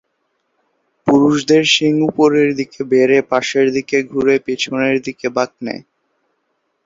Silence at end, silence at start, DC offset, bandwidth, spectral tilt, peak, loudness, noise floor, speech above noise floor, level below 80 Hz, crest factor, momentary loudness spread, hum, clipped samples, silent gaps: 1.05 s; 1.05 s; under 0.1%; 7.8 kHz; -4.5 dB/octave; 0 dBFS; -15 LUFS; -68 dBFS; 53 dB; -56 dBFS; 16 dB; 10 LU; none; under 0.1%; none